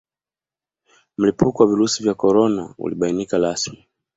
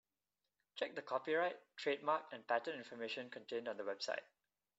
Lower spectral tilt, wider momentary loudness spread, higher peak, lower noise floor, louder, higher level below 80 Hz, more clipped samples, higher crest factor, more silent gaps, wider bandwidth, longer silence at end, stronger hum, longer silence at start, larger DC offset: first, -5 dB/octave vs -1 dB/octave; about the same, 10 LU vs 8 LU; first, -2 dBFS vs -22 dBFS; about the same, under -90 dBFS vs under -90 dBFS; first, -19 LUFS vs -42 LUFS; first, -54 dBFS vs under -90 dBFS; neither; about the same, 18 dB vs 20 dB; neither; about the same, 8 kHz vs 8 kHz; second, 0.4 s vs 0.55 s; neither; first, 1.2 s vs 0.75 s; neither